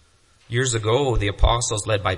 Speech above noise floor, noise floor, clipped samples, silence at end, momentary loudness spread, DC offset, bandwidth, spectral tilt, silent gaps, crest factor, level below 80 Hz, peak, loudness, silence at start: 36 dB; -56 dBFS; under 0.1%; 0 s; 3 LU; under 0.1%; 11.5 kHz; -4 dB/octave; none; 20 dB; -28 dBFS; -2 dBFS; -21 LUFS; 0.5 s